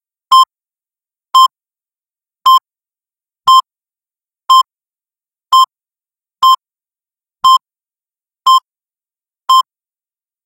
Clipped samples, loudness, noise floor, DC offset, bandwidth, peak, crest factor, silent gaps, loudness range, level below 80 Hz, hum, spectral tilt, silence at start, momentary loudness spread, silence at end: 0.2%; -11 LUFS; under -90 dBFS; under 0.1%; 16.5 kHz; 0 dBFS; 14 dB; none; 1 LU; -66 dBFS; none; 3 dB/octave; 0.3 s; 7 LU; 0.85 s